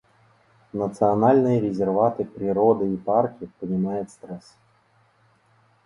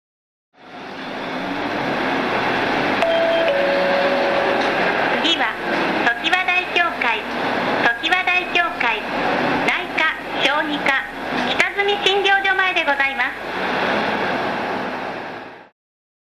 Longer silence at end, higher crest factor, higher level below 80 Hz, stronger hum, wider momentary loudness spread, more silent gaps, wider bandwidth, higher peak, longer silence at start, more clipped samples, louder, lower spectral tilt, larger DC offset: first, 1.45 s vs 0.6 s; about the same, 18 dB vs 18 dB; second, -60 dBFS vs -52 dBFS; neither; first, 17 LU vs 8 LU; neither; second, 11 kHz vs 14 kHz; second, -6 dBFS vs -2 dBFS; first, 0.75 s vs 0.6 s; neither; second, -22 LUFS vs -18 LUFS; first, -9.5 dB/octave vs -4 dB/octave; neither